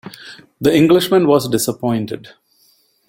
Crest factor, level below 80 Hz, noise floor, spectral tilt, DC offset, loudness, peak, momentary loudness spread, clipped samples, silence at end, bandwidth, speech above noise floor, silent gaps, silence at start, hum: 16 dB; -52 dBFS; -57 dBFS; -5.5 dB/octave; under 0.1%; -15 LUFS; -2 dBFS; 19 LU; under 0.1%; 0.8 s; 16.5 kHz; 42 dB; none; 0.05 s; none